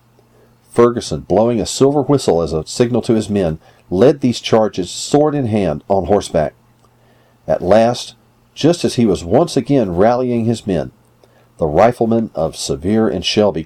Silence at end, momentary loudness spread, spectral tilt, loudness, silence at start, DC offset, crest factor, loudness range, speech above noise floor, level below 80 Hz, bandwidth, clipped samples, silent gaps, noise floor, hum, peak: 0 s; 9 LU; -6 dB/octave; -15 LUFS; 0.75 s; under 0.1%; 14 dB; 2 LU; 37 dB; -42 dBFS; 14.5 kHz; under 0.1%; none; -51 dBFS; none; 0 dBFS